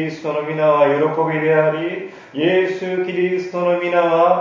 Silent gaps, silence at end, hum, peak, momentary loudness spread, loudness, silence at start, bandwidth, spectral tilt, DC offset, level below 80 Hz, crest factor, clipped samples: none; 0 s; none; -2 dBFS; 9 LU; -18 LUFS; 0 s; 7.4 kHz; -7 dB/octave; under 0.1%; -68 dBFS; 16 dB; under 0.1%